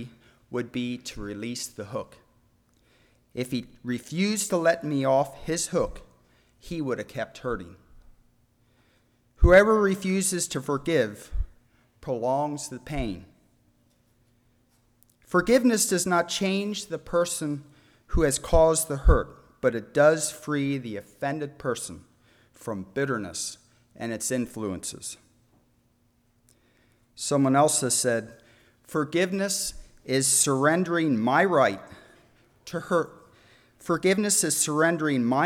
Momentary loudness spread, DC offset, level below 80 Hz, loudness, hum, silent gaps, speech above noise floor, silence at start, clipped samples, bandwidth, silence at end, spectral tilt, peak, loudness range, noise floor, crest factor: 16 LU; under 0.1%; -38 dBFS; -25 LUFS; none; none; 41 dB; 0 s; under 0.1%; 19.5 kHz; 0 s; -4 dB/octave; -6 dBFS; 10 LU; -66 dBFS; 20 dB